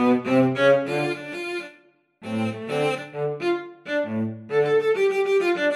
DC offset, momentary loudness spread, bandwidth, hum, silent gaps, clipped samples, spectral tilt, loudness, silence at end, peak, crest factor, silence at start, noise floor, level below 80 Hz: under 0.1%; 11 LU; 13 kHz; none; none; under 0.1%; -6.5 dB/octave; -23 LUFS; 0 s; -6 dBFS; 16 dB; 0 s; -57 dBFS; -72 dBFS